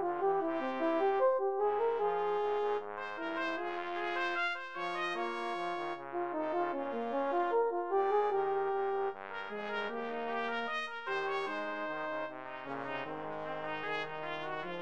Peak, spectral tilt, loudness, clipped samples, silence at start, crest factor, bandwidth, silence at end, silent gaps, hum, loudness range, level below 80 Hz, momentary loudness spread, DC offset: -20 dBFS; -5 dB/octave; -35 LUFS; under 0.1%; 0 s; 16 dB; 8.2 kHz; 0 s; none; none; 5 LU; -80 dBFS; 8 LU; 0.2%